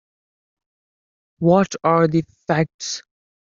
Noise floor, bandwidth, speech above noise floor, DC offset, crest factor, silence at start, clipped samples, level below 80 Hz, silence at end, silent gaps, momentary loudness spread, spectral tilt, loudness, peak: under -90 dBFS; 7.6 kHz; over 72 dB; under 0.1%; 18 dB; 1.4 s; under 0.1%; -58 dBFS; 0.45 s; 2.74-2.79 s; 11 LU; -6 dB/octave; -19 LUFS; -2 dBFS